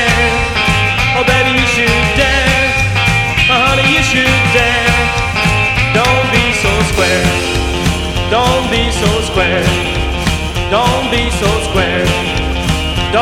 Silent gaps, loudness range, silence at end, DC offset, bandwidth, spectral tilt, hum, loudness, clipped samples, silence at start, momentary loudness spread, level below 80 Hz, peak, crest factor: none; 4 LU; 0 s; under 0.1%; 16.5 kHz; -4 dB/octave; none; -11 LUFS; under 0.1%; 0 s; 6 LU; -22 dBFS; 0 dBFS; 12 dB